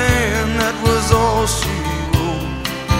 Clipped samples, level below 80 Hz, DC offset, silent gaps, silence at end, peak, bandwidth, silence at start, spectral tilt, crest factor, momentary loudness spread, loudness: under 0.1%; -26 dBFS; under 0.1%; none; 0 s; 0 dBFS; 16.5 kHz; 0 s; -4.5 dB/octave; 16 dB; 7 LU; -17 LUFS